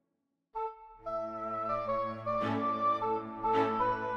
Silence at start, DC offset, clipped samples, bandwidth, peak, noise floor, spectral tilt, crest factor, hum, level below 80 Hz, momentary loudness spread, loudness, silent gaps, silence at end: 0.55 s; under 0.1%; under 0.1%; 8.2 kHz; -16 dBFS; -82 dBFS; -7.5 dB/octave; 16 dB; none; -60 dBFS; 10 LU; -33 LUFS; none; 0 s